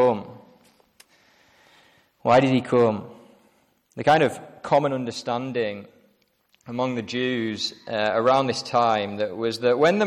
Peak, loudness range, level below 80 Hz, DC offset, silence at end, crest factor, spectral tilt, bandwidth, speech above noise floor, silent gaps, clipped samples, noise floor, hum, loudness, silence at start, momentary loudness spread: -8 dBFS; 4 LU; -64 dBFS; under 0.1%; 0 s; 16 dB; -5.5 dB/octave; 13 kHz; 43 dB; none; under 0.1%; -65 dBFS; none; -23 LUFS; 0 s; 12 LU